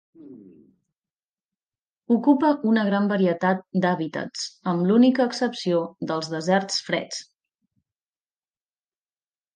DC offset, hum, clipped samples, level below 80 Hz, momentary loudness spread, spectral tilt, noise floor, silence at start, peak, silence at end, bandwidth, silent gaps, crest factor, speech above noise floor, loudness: under 0.1%; none; under 0.1%; -76 dBFS; 11 LU; -5.5 dB/octave; under -90 dBFS; 0.25 s; -6 dBFS; 2.35 s; 9.8 kHz; 1.11-1.36 s, 1.45-1.49 s, 1.63-1.67 s, 1.86-1.96 s; 18 dB; over 68 dB; -23 LUFS